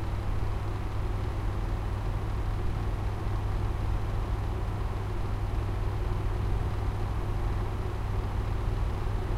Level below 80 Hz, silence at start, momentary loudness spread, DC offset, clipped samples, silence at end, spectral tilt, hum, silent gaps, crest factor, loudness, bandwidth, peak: -32 dBFS; 0 s; 2 LU; under 0.1%; under 0.1%; 0 s; -7.5 dB/octave; none; none; 12 dB; -33 LUFS; 12.5 kHz; -16 dBFS